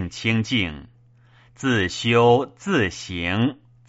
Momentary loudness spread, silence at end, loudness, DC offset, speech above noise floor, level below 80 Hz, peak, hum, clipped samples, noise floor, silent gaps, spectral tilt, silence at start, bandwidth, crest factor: 10 LU; 0.35 s; -21 LUFS; under 0.1%; 32 dB; -50 dBFS; -4 dBFS; none; under 0.1%; -54 dBFS; none; -4 dB/octave; 0 s; 8 kHz; 18 dB